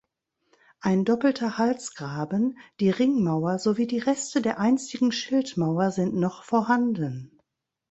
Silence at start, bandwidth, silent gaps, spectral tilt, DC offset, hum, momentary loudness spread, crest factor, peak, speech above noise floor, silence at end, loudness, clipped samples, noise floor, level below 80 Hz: 0.85 s; 8.2 kHz; none; -6 dB/octave; under 0.1%; none; 7 LU; 18 dB; -8 dBFS; 52 dB; 0.65 s; -25 LUFS; under 0.1%; -76 dBFS; -66 dBFS